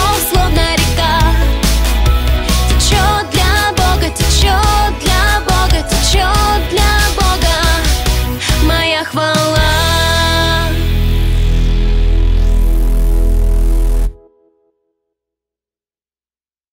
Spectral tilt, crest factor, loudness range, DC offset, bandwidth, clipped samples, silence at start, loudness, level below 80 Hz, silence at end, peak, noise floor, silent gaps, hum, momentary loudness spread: -4 dB/octave; 12 dB; 6 LU; under 0.1%; 16.5 kHz; under 0.1%; 0 s; -13 LUFS; -14 dBFS; 2.6 s; 0 dBFS; under -90 dBFS; none; none; 4 LU